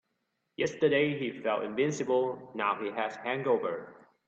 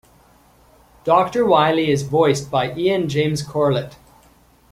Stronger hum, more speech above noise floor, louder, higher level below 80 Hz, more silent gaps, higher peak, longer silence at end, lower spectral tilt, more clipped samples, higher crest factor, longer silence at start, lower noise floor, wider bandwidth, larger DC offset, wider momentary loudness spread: neither; first, 50 dB vs 35 dB; second, -31 LUFS vs -18 LUFS; second, -74 dBFS vs -52 dBFS; neither; second, -14 dBFS vs -2 dBFS; second, 0.35 s vs 0.75 s; about the same, -5 dB/octave vs -6 dB/octave; neither; about the same, 18 dB vs 18 dB; second, 0.6 s vs 1.05 s; first, -80 dBFS vs -53 dBFS; second, 8 kHz vs 15.5 kHz; neither; about the same, 8 LU vs 7 LU